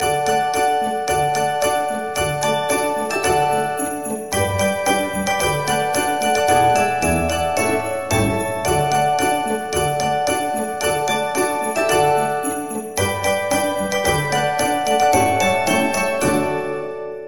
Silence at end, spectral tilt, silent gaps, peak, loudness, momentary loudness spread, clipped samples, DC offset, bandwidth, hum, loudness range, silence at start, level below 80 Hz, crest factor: 0 s; -3.5 dB/octave; none; -4 dBFS; -19 LUFS; 6 LU; under 0.1%; 0.6%; 17 kHz; none; 2 LU; 0 s; -42 dBFS; 14 dB